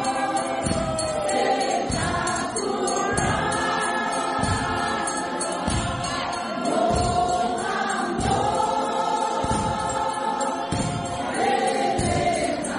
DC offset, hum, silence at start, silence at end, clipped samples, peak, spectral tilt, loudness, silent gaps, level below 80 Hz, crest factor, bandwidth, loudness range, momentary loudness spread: under 0.1%; none; 0 s; 0 s; under 0.1%; -8 dBFS; -4 dB/octave; -24 LUFS; none; -42 dBFS; 16 dB; 11.5 kHz; 1 LU; 4 LU